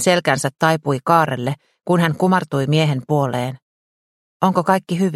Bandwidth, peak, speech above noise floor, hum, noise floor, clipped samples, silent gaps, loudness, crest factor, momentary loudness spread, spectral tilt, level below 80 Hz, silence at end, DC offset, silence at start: 14 kHz; 0 dBFS; over 72 dB; none; under -90 dBFS; under 0.1%; 3.62-4.40 s; -18 LUFS; 18 dB; 8 LU; -5.5 dB/octave; -60 dBFS; 0 s; under 0.1%; 0 s